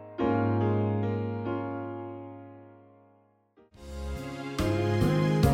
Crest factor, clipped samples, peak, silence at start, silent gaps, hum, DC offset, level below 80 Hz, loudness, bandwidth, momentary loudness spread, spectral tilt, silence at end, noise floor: 20 dB; under 0.1%; -10 dBFS; 0 s; none; none; under 0.1%; -44 dBFS; -29 LUFS; 16 kHz; 19 LU; -7.5 dB/octave; 0 s; -64 dBFS